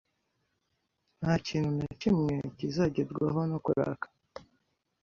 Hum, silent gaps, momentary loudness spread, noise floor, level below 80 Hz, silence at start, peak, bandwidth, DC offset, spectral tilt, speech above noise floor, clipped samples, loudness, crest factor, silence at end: none; none; 13 LU; -79 dBFS; -58 dBFS; 1.2 s; -14 dBFS; 7.2 kHz; under 0.1%; -7.5 dB/octave; 49 dB; under 0.1%; -31 LUFS; 18 dB; 0.6 s